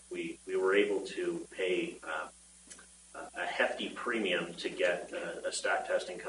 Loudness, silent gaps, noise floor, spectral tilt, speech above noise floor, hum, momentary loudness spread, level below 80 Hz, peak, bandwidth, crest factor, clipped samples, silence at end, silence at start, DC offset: -34 LUFS; none; -55 dBFS; -3 dB/octave; 20 dB; none; 17 LU; -70 dBFS; -14 dBFS; 11 kHz; 22 dB; under 0.1%; 0 s; 0 s; under 0.1%